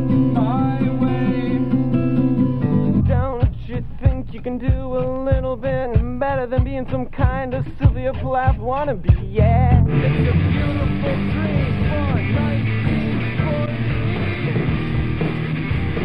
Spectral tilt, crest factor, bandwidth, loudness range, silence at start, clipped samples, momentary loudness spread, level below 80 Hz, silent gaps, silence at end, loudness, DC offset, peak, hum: -10.5 dB/octave; 16 dB; 5.2 kHz; 3 LU; 0 s; under 0.1%; 5 LU; -26 dBFS; none; 0 s; -20 LUFS; under 0.1%; -2 dBFS; none